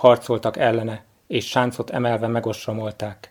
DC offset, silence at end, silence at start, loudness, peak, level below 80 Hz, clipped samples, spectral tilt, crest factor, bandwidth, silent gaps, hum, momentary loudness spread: under 0.1%; 0.15 s; 0 s; -23 LUFS; 0 dBFS; -62 dBFS; under 0.1%; -6 dB/octave; 20 dB; 18 kHz; none; none; 10 LU